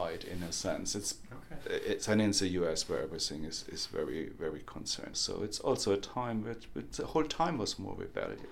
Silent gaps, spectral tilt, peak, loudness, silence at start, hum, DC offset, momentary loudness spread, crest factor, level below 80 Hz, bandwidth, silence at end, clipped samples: none; -3.5 dB/octave; -16 dBFS; -35 LUFS; 0 s; none; under 0.1%; 10 LU; 18 dB; -54 dBFS; 17 kHz; 0 s; under 0.1%